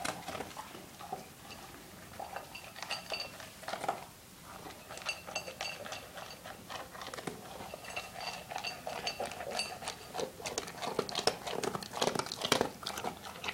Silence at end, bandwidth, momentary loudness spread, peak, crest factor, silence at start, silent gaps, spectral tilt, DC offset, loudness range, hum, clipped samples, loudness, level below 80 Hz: 0 s; 17 kHz; 14 LU; -8 dBFS; 32 dB; 0 s; none; -2.5 dB/octave; under 0.1%; 7 LU; none; under 0.1%; -39 LUFS; -66 dBFS